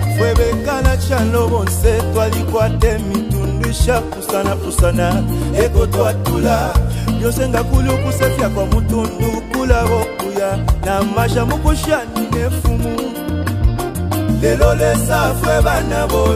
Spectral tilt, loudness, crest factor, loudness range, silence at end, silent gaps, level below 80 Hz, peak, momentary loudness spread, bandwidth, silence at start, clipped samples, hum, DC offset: -6 dB/octave; -16 LUFS; 14 dB; 2 LU; 0 s; none; -20 dBFS; 0 dBFS; 4 LU; 16 kHz; 0 s; under 0.1%; none; under 0.1%